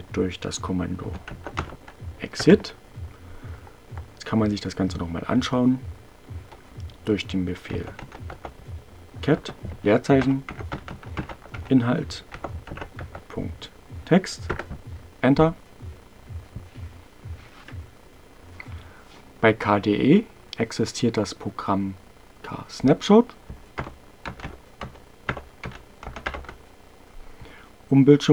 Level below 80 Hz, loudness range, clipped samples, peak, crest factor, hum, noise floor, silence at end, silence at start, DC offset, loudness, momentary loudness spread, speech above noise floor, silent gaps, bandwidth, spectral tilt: -46 dBFS; 13 LU; under 0.1%; 0 dBFS; 24 dB; none; -50 dBFS; 0 s; 0 s; 0.2%; -24 LUFS; 23 LU; 28 dB; none; 13 kHz; -6.5 dB/octave